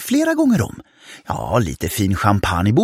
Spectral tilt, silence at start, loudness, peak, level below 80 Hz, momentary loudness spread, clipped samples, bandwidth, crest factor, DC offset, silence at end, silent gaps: -6 dB/octave; 0 s; -18 LUFS; -2 dBFS; -38 dBFS; 11 LU; under 0.1%; 16.5 kHz; 16 dB; under 0.1%; 0 s; none